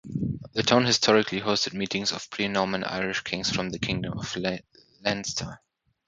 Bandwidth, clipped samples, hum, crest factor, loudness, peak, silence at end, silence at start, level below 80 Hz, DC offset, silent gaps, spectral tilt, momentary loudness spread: 9.4 kHz; under 0.1%; none; 24 dB; -26 LUFS; -2 dBFS; 0.5 s; 0.05 s; -54 dBFS; under 0.1%; none; -3.5 dB/octave; 11 LU